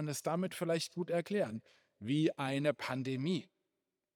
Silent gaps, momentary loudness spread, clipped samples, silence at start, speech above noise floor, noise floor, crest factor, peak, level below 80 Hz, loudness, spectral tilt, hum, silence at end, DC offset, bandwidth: none; 6 LU; under 0.1%; 0 s; 52 dB; -88 dBFS; 20 dB; -18 dBFS; -88 dBFS; -36 LUFS; -5.5 dB/octave; none; 0.7 s; under 0.1%; over 20 kHz